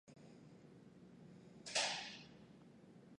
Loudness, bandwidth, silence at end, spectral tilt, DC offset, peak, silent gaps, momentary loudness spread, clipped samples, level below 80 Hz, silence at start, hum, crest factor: -42 LUFS; 11 kHz; 0 s; -1 dB/octave; under 0.1%; -24 dBFS; none; 24 LU; under 0.1%; -82 dBFS; 0.05 s; none; 26 dB